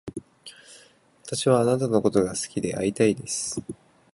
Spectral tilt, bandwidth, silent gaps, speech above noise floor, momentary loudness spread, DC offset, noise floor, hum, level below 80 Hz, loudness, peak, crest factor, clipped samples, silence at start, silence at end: -5 dB/octave; 11.5 kHz; none; 32 dB; 23 LU; under 0.1%; -55 dBFS; none; -56 dBFS; -24 LUFS; -6 dBFS; 20 dB; under 0.1%; 0.05 s; 0.4 s